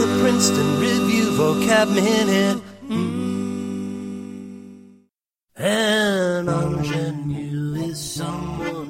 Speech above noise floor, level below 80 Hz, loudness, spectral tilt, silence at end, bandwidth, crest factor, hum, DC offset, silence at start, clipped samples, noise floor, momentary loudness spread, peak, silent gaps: 54 dB; -50 dBFS; -21 LUFS; -4.5 dB/octave; 0 s; 16.5 kHz; 18 dB; none; under 0.1%; 0 s; under 0.1%; -72 dBFS; 12 LU; -2 dBFS; none